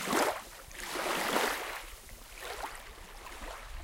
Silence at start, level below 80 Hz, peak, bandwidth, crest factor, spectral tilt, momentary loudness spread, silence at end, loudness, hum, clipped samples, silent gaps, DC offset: 0 s; -52 dBFS; -14 dBFS; 17 kHz; 22 dB; -2 dB/octave; 17 LU; 0 s; -35 LUFS; none; under 0.1%; none; under 0.1%